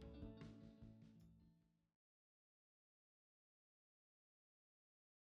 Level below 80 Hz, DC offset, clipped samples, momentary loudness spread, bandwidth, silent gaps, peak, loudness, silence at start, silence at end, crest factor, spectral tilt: -74 dBFS; under 0.1%; under 0.1%; 9 LU; 6.4 kHz; none; -44 dBFS; -62 LUFS; 0 s; 3.45 s; 22 dB; -7.5 dB/octave